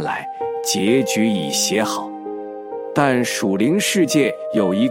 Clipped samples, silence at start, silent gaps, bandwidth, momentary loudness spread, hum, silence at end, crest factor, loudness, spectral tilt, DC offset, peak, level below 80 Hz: under 0.1%; 0 s; none; 16.5 kHz; 13 LU; none; 0 s; 18 dB; -19 LUFS; -4 dB/octave; under 0.1%; -2 dBFS; -66 dBFS